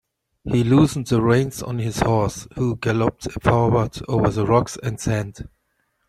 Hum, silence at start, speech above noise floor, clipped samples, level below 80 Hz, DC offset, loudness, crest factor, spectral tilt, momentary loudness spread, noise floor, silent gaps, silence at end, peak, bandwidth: none; 0.45 s; 50 dB; under 0.1%; -42 dBFS; under 0.1%; -21 LUFS; 18 dB; -6.5 dB/octave; 9 LU; -70 dBFS; none; 0.6 s; -2 dBFS; 13.5 kHz